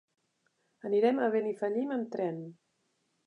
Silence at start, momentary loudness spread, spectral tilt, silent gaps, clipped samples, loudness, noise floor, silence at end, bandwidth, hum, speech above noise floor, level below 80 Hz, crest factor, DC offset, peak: 0.85 s; 16 LU; -7.5 dB/octave; none; under 0.1%; -31 LUFS; -77 dBFS; 0.75 s; 8.6 kHz; none; 47 dB; -90 dBFS; 18 dB; under 0.1%; -14 dBFS